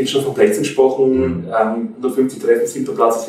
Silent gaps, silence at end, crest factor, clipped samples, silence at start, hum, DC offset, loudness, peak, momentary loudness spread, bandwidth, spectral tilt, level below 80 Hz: none; 0 s; 14 dB; under 0.1%; 0 s; none; under 0.1%; -16 LUFS; -2 dBFS; 5 LU; 15.5 kHz; -5 dB/octave; -50 dBFS